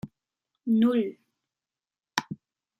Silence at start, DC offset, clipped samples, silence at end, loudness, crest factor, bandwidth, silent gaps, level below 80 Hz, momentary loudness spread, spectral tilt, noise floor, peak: 0.05 s; under 0.1%; under 0.1%; 0.45 s; -27 LUFS; 24 dB; 12.5 kHz; none; -72 dBFS; 21 LU; -5 dB/octave; under -90 dBFS; -6 dBFS